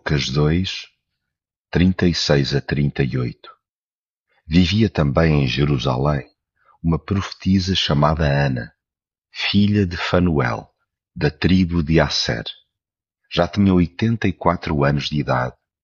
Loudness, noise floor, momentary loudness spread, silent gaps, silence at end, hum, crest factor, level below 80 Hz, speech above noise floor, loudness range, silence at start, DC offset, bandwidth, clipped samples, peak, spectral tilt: -19 LUFS; under -90 dBFS; 9 LU; 1.56-1.65 s, 3.69-4.24 s; 0.3 s; none; 18 dB; -36 dBFS; over 72 dB; 2 LU; 0.05 s; under 0.1%; 7.4 kHz; under 0.1%; -2 dBFS; -5 dB/octave